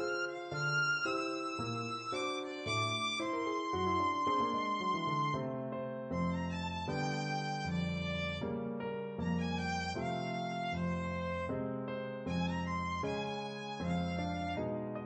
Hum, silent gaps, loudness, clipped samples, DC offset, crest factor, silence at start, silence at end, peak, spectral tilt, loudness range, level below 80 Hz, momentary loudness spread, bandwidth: none; none; -36 LUFS; under 0.1%; under 0.1%; 14 dB; 0 s; 0 s; -22 dBFS; -5.5 dB/octave; 3 LU; -60 dBFS; 7 LU; 8.4 kHz